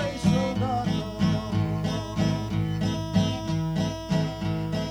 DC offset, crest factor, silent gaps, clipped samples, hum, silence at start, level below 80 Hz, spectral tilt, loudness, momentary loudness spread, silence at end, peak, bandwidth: under 0.1%; 16 dB; none; under 0.1%; none; 0 s; -42 dBFS; -6.5 dB/octave; -27 LUFS; 4 LU; 0 s; -10 dBFS; 13 kHz